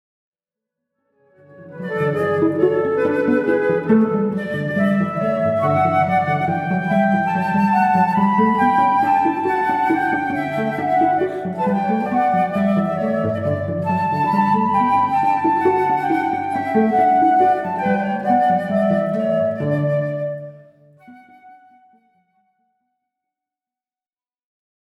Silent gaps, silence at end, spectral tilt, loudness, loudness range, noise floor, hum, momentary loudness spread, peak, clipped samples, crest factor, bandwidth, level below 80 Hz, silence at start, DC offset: none; 3.5 s; -8.5 dB/octave; -18 LUFS; 5 LU; under -90 dBFS; none; 6 LU; -4 dBFS; under 0.1%; 16 dB; 12.5 kHz; -64 dBFS; 1.55 s; under 0.1%